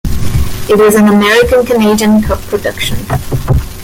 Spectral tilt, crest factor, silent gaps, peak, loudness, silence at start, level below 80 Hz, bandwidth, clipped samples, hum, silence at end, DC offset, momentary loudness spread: -5.5 dB/octave; 10 dB; none; 0 dBFS; -10 LUFS; 0.05 s; -22 dBFS; 17 kHz; under 0.1%; none; 0 s; under 0.1%; 10 LU